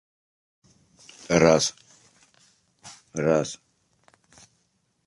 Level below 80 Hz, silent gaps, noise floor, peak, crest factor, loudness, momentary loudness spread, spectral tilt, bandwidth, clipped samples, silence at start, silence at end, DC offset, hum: -58 dBFS; none; -71 dBFS; -2 dBFS; 26 dB; -23 LUFS; 27 LU; -4.5 dB/octave; 11.5 kHz; under 0.1%; 1.3 s; 1.5 s; under 0.1%; none